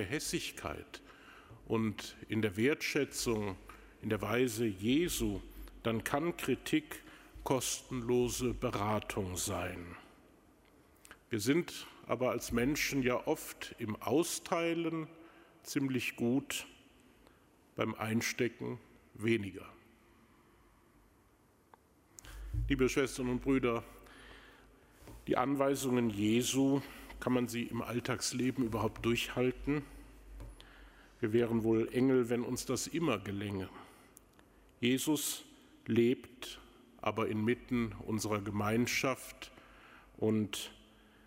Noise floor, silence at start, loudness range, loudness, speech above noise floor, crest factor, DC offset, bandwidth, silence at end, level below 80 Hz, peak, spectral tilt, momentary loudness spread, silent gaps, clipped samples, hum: -67 dBFS; 0 s; 4 LU; -35 LUFS; 33 dB; 22 dB; under 0.1%; 16 kHz; 0.5 s; -56 dBFS; -14 dBFS; -4.5 dB/octave; 19 LU; none; under 0.1%; none